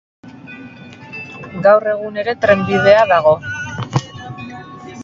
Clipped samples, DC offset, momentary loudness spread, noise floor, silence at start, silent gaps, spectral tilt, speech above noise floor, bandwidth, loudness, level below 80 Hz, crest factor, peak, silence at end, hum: under 0.1%; under 0.1%; 24 LU; -36 dBFS; 0.25 s; none; -6 dB/octave; 23 dB; 7.6 kHz; -14 LUFS; -48 dBFS; 16 dB; 0 dBFS; 0 s; none